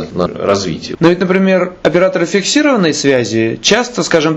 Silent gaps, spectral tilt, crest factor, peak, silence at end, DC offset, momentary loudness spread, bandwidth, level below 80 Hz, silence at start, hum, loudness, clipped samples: none; -4.5 dB/octave; 12 dB; 0 dBFS; 0 s; under 0.1%; 4 LU; 8.4 kHz; -46 dBFS; 0 s; none; -12 LUFS; under 0.1%